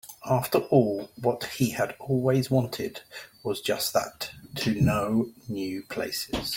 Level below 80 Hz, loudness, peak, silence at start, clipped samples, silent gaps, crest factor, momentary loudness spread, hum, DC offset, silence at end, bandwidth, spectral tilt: -52 dBFS; -27 LUFS; -6 dBFS; 0.05 s; under 0.1%; none; 22 dB; 12 LU; none; under 0.1%; 0 s; 17 kHz; -5.5 dB/octave